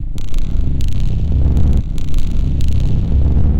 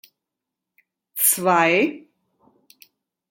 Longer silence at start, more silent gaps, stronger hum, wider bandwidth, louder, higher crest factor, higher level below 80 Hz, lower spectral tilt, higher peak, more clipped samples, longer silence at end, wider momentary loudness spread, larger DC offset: second, 0 s vs 1.15 s; neither; neither; second, 7.8 kHz vs 17 kHz; about the same, -18 LUFS vs -18 LUFS; second, 10 dB vs 22 dB; first, -14 dBFS vs -76 dBFS; first, -8 dB/octave vs -3 dB/octave; about the same, -2 dBFS vs -4 dBFS; neither; second, 0 s vs 1.35 s; about the same, 8 LU vs 9 LU; neither